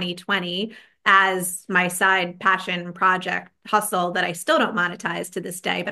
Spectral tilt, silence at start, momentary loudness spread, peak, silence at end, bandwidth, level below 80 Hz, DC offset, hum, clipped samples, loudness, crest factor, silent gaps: -3 dB/octave; 0 s; 11 LU; -2 dBFS; 0 s; 13 kHz; -70 dBFS; under 0.1%; none; under 0.1%; -21 LUFS; 20 dB; none